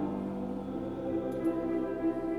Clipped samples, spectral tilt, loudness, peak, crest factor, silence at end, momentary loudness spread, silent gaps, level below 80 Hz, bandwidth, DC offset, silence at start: under 0.1%; -9 dB/octave; -34 LUFS; -20 dBFS; 12 dB; 0 s; 5 LU; none; -56 dBFS; 11.5 kHz; under 0.1%; 0 s